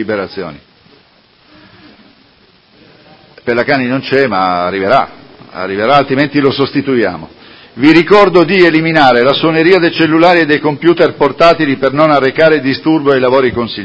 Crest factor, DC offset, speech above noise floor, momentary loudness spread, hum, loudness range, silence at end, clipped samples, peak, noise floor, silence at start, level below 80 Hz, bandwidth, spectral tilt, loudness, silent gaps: 10 dB; under 0.1%; 38 dB; 10 LU; none; 9 LU; 0 s; 0.8%; 0 dBFS; -47 dBFS; 0 s; -46 dBFS; 8 kHz; -7 dB/octave; -10 LUFS; none